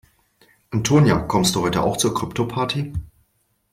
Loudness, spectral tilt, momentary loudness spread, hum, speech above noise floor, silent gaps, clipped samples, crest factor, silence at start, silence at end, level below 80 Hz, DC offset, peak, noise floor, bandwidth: -20 LUFS; -5 dB/octave; 11 LU; none; 47 dB; none; under 0.1%; 18 dB; 0.7 s; 0.65 s; -42 dBFS; under 0.1%; -4 dBFS; -67 dBFS; 16 kHz